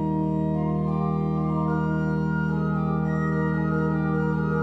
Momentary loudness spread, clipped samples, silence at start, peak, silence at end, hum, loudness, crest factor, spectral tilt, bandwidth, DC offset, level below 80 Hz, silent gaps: 1 LU; under 0.1%; 0 s; -14 dBFS; 0 s; none; -25 LUFS; 10 dB; -10.5 dB/octave; 4.5 kHz; under 0.1%; -44 dBFS; none